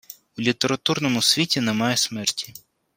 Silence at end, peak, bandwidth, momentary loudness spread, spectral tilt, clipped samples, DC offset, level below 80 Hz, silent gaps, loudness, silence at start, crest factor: 0.4 s; -2 dBFS; 16.5 kHz; 11 LU; -3 dB/octave; under 0.1%; under 0.1%; -64 dBFS; none; -21 LUFS; 0.1 s; 20 dB